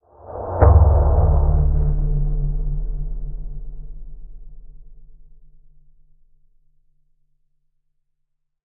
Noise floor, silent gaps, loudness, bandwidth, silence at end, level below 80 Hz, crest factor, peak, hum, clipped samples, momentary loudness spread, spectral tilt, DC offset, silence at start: -71 dBFS; none; -19 LUFS; 2.2 kHz; 3.45 s; -22 dBFS; 18 dB; -2 dBFS; none; under 0.1%; 24 LU; -8.5 dB/octave; under 0.1%; 0.25 s